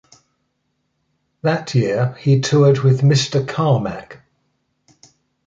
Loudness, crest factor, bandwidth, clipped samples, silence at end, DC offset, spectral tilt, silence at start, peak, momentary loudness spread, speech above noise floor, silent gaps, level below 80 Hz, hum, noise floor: -17 LUFS; 16 dB; 7.8 kHz; under 0.1%; 1.35 s; under 0.1%; -6.5 dB/octave; 1.45 s; -2 dBFS; 8 LU; 54 dB; none; -54 dBFS; none; -70 dBFS